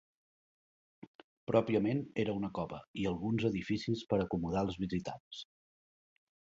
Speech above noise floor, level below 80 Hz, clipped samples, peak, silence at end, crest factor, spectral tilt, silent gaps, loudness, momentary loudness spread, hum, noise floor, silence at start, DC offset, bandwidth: over 55 dB; -60 dBFS; under 0.1%; -14 dBFS; 1.15 s; 22 dB; -6 dB/octave; 1.07-1.47 s, 2.87-2.94 s, 5.20-5.31 s; -35 LUFS; 14 LU; none; under -90 dBFS; 1.05 s; under 0.1%; 7.6 kHz